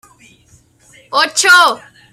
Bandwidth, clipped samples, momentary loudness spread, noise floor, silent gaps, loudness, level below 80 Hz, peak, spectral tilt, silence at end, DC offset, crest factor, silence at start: 16 kHz; under 0.1%; 12 LU; -50 dBFS; none; -10 LUFS; -62 dBFS; 0 dBFS; 1 dB/octave; 0.35 s; under 0.1%; 16 dB; 1.1 s